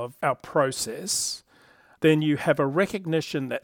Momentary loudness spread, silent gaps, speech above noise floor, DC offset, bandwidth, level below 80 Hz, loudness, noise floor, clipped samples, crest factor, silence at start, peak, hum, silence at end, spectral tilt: 8 LU; none; 32 dB; under 0.1%; 18 kHz; -64 dBFS; -25 LUFS; -57 dBFS; under 0.1%; 18 dB; 0 s; -8 dBFS; none; 0.05 s; -4.5 dB/octave